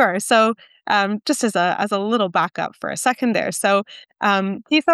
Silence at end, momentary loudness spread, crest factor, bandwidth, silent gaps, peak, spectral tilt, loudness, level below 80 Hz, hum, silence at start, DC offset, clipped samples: 0 s; 7 LU; 16 dB; 12.5 kHz; none; -4 dBFS; -3.5 dB/octave; -19 LUFS; -72 dBFS; none; 0 s; under 0.1%; under 0.1%